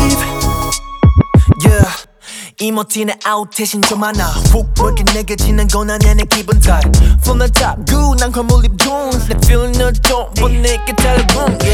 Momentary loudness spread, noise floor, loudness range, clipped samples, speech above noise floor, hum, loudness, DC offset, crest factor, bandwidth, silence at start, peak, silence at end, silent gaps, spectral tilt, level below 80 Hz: 6 LU; -32 dBFS; 2 LU; under 0.1%; 21 dB; none; -13 LUFS; under 0.1%; 10 dB; 18 kHz; 0 s; 0 dBFS; 0 s; none; -4.5 dB/octave; -14 dBFS